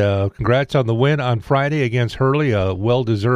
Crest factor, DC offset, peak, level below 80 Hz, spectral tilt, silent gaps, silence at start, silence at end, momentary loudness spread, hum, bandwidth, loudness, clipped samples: 14 dB; under 0.1%; -4 dBFS; -42 dBFS; -7.5 dB/octave; none; 0 s; 0 s; 2 LU; none; 10.5 kHz; -18 LUFS; under 0.1%